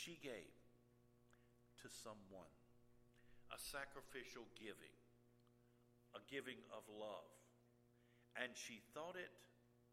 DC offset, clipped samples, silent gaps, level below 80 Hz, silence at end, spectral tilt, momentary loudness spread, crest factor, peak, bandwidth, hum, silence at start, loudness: under 0.1%; under 0.1%; none; -80 dBFS; 0 s; -2.5 dB/octave; 12 LU; 28 dB; -30 dBFS; 15.5 kHz; none; 0 s; -55 LUFS